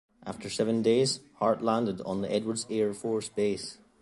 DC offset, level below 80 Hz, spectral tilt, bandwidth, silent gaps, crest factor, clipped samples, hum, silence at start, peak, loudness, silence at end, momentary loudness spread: under 0.1%; -66 dBFS; -5 dB/octave; 11.5 kHz; none; 18 dB; under 0.1%; none; 0.25 s; -12 dBFS; -29 LUFS; 0.25 s; 11 LU